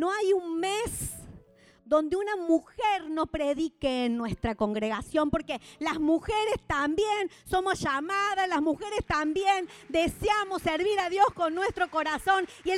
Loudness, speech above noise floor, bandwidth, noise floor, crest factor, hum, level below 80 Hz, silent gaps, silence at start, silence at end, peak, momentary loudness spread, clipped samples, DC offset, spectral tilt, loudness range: -28 LUFS; 29 dB; 16 kHz; -57 dBFS; 18 dB; none; -50 dBFS; none; 0 s; 0 s; -10 dBFS; 5 LU; under 0.1%; under 0.1%; -4.5 dB/octave; 2 LU